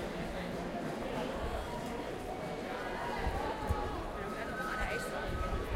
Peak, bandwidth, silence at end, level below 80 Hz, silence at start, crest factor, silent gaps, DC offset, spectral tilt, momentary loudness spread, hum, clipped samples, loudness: -20 dBFS; 16 kHz; 0 s; -44 dBFS; 0 s; 16 dB; none; under 0.1%; -5.5 dB/octave; 4 LU; none; under 0.1%; -38 LUFS